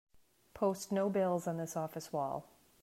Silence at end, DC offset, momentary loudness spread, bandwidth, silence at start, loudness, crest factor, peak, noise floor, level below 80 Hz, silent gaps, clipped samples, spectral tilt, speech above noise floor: 0.35 s; under 0.1%; 8 LU; 16 kHz; 0.55 s; -37 LUFS; 16 dB; -20 dBFS; -60 dBFS; -74 dBFS; none; under 0.1%; -6 dB/octave; 24 dB